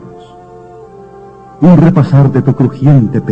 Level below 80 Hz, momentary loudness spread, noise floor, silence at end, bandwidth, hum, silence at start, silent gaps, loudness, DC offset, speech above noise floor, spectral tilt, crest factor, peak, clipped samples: -38 dBFS; 5 LU; -33 dBFS; 0 s; 5.4 kHz; none; 0 s; none; -8 LUFS; under 0.1%; 26 dB; -10.5 dB/octave; 10 dB; 0 dBFS; 0.2%